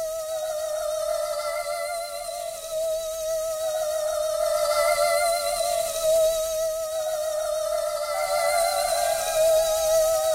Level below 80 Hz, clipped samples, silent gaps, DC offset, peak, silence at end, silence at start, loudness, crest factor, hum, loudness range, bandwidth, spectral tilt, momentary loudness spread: -52 dBFS; under 0.1%; none; under 0.1%; -10 dBFS; 0 s; 0 s; -25 LUFS; 14 dB; none; 5 LU; 16 kHz; 0.5 dB/octave; 8 LU